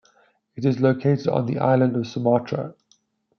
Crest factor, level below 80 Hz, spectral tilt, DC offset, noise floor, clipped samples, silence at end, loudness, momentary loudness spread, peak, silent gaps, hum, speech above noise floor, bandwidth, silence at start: 18 dB; -66 dBFS; -8.5 dB/octave; under 0.1%; -64 dBFS; under 0.1%; 0.65 s; -22 LUFS; 9 LU; -6 dBFS; none; none; 43 dB; 6.6 kHz; 0.55 s